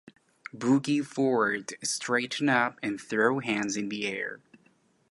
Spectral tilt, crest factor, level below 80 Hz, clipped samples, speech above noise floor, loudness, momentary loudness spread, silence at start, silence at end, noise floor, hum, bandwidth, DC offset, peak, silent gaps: -4 dB/octave; 20 dB; -76 dBFS; under 0.1%; 38 dB; -28 LUFS; 10 LU; 0.55 s; 0.75 s; -66 dBFS; none; 11.5 kHz; under 0.1%; -10 dBFS; none